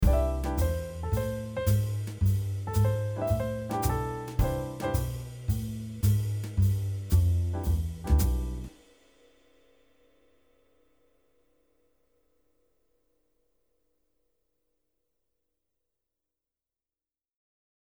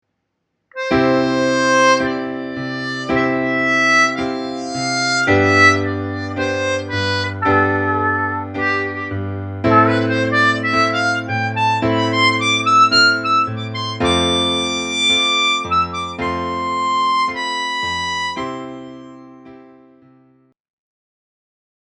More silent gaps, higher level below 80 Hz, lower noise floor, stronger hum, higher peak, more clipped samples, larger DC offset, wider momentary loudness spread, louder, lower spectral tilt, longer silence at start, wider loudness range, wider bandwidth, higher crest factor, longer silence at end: neither; first, -36 dBFS vs -48 dBFS; first, under -90 dBFS vs -73 dBFS; neither; second, -12 dBFS vs 0 dBFS; neither; neither; second, 7 LU vs 12 LU; second, -30 LUFS vs -16 LUFS; first, -7 dB/octave vs -4 dB/octave; second, 0 s vs 0.75 s; about the same, 5 LU vs 6 LU; first, over 20 kHz vs 11 kHz; about the same, 18 dB vs 18 dB; first, 9.2 s vs 2.3 s